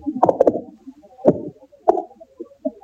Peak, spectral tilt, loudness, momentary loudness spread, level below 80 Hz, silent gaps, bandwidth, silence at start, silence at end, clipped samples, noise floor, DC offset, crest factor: 0 dBFS; -9.5 dB/octave; -20 LUFS; 23 LU; -60 dBFS; none; 7.8 kHz; 0 s; 0.1 s; under 0.1%; -43 dBFS; under 0.1%; 20 dB